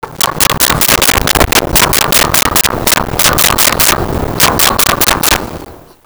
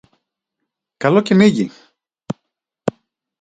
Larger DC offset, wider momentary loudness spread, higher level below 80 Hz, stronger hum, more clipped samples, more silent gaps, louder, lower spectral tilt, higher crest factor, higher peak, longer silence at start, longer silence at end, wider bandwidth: neither; second, 5 LU vs 18 LU; first, -24 dBFS vs -58 dBFS; neither; neither; neither; first, -8 LUFS vs -16 LUFS; second, -2 dB/octave vs -7 dB/octave; second, 10 dB vs 20 dB; about the same, 0 dBFS vs 0 dBFS; second, 0.05 s vs 1 s; second, 0.25 s vs 0.5 s; first, over 20 kHz vs 9.2 kHz